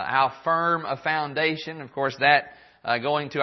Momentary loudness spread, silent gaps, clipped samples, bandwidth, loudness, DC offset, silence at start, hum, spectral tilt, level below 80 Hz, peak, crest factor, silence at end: 13 LU; none; under 0.1%; 6.2 kHz; -24 LUFS; under 0.1%; 0 s; none; -5.5 dB/octave; -70 dBFS; -4 dBFS; 20 dB; 0 s